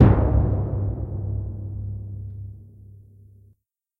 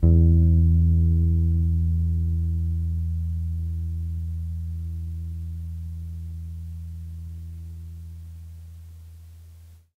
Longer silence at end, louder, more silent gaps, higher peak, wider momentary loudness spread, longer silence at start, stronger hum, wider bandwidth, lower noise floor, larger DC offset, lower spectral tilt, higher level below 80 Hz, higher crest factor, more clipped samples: first, 1.05 s vs 0.25 s; about the same, -25 LUFS vs -24 LUFS; neither; first, 0 dBFS vs -6 dBFS; second, 19 LU vs 22 LU; about the same, 0 s vs 0 s; neither; first, 3.5 kHz vs 0.8 kHz; first, -64 dBFS vs -48 dBFS; neither; about the same, -12 dB/octave vs -11 dB/octave; about the same, -30 dBFS vs -32 dBFS; about the same, 22 dB vs 18 dB; neither